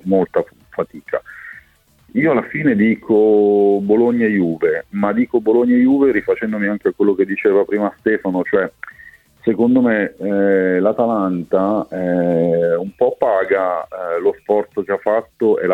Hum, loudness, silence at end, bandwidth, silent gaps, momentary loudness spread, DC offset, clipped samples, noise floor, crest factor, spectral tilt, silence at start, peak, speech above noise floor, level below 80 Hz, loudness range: none; -17 LUFS; 0 s; 4.2 kHz; none; 10 LU; under 0.1%; under 0.1%; -53 dBFS; 14 dB; -9.5 dB/octave; 0.05 s; -2 dBFS; 37 dB; -56 dBFS; 3 LU